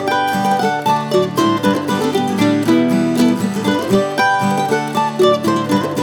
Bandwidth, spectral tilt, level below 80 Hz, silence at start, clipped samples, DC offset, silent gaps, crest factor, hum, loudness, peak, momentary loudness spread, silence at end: over 20 kHz; -5.5 dB/octave; -60 dBFS; 0 s; under 0.1%; under 0.1%; none; 14 dB; none; -15 LUFS; -2 dBFS; 3 LU; 0 s